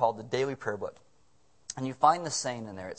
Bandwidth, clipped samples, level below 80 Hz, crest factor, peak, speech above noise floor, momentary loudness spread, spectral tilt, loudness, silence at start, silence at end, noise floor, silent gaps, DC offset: 8.8 kHz; under 0.1%; -72 dBFS; 22 dB; -8 dBFS; 38 dB; 16 LU; -4 dB/octave; -30 LUFS; 0 s; 0.05 s; -68 dBFS; none; under 0.1%